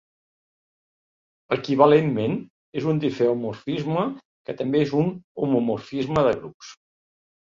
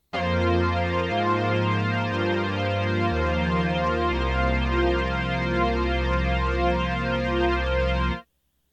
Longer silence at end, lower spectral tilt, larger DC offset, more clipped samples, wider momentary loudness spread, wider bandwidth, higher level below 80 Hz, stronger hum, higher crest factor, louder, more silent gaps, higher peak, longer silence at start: first, 0.7 s vs 0.5 s; about the same, -7.5 dB/octave vs -7 dB/octave; neither; neither; first, 15 LU vs 2 LU; about the same, 7.4 kHz vs 7.8 kHz; second, -60 dBFS vs -30 dBFS; neither; first, 22 dB vs 12 dB; about the same, -23 LUFS vs -24 LUFS; first, 2.50-2.73 s, 4.25-4.45 s, 5.24-5.35 s, 6.54-6.60 s vs none; first, -2 dBFS vs -10 dBFS; first, 1.5 s vs 0.15 s